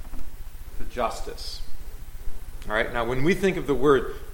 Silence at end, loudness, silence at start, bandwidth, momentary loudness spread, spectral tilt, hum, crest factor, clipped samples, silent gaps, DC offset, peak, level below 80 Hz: 0 s; -25 LUFS; 0 s; 17 kHz; 22 LU; -5.5 dB/octave; none; 18 dB; under 0.1%; none; under 0.1%; -6 dBFS; -34 dBFS